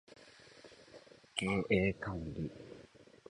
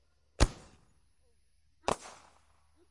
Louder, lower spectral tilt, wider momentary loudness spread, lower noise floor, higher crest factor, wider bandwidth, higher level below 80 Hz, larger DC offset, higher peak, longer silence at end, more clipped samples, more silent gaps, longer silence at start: about the same, -36 LUFS vs -35 LUFS; about the same, -5.5 dB/octave vs -4.5 dB/octave; first, 25 LU vs 21 LU; second, -59 dBFS vs -73 dBFS; about the same, 24 dB vs 28 dB; about the same, 11 kHz vs 11.5 kHz; second, -58 dBFS vs -40 dBFS; neither; second, -16 dBFS vs -10 dBFS; second, 0.5 s vs 0.8 s; neither; neither; second, 0.1 s vs 0.4 s